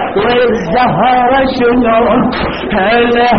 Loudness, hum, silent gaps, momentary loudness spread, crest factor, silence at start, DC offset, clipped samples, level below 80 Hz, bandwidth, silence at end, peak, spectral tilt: -10 LUFS; none; none; 4 LU; 10 dB; 0 s; 0.8%; under 0.1%; -32 dBFS; 6.4 kHz; 0 s; 0 dBFS; -3.5 dB/octave